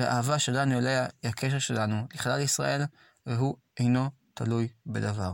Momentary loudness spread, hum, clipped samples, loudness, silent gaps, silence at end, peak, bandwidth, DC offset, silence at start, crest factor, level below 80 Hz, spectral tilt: 7 LU; none; under 0.1%; -29 LUFS; none; 0 s; -14 dBFS; 17 kHz; under 0.1%; 0 s; 14 dB; -62 dBFS; -5 dB/octave